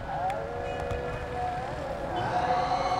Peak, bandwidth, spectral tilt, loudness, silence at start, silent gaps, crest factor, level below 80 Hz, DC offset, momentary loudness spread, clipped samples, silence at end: -14 dBFS; 12.5 kHz; -5.5 dB/octave; -31 LUFS; 0 s; none; 16 dB; -44 dBFS; under 0.1%; 7 LU; under 0.1%; 0 s